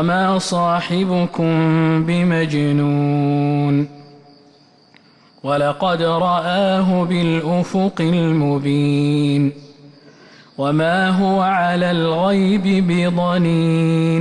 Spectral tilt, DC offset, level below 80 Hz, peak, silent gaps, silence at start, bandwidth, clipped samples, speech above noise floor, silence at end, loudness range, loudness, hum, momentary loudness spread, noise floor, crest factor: -7 dB/octave; under 0.1%; -52 dBFS; -6 dBFS; none; 0 s; 11 kHz; under 0.1%; 34 dB; 0 s; 4 LU; -17 LUFS; none; 3 LU; -50 dBFS; 10 dB